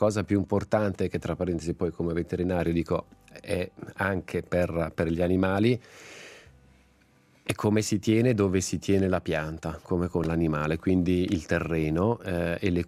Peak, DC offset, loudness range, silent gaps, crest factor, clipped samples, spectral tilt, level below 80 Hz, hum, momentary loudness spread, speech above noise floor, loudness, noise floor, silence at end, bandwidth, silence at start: -8 dBFS; under 0.1%; 3 LU; none; 18 dB; under 0.1%; -6.5 dB/octave; -52 dBFS; none; 8 LU; 35 dB; -27 LUFS; -61 dBFS; 0 s; 15 kHz; 0 s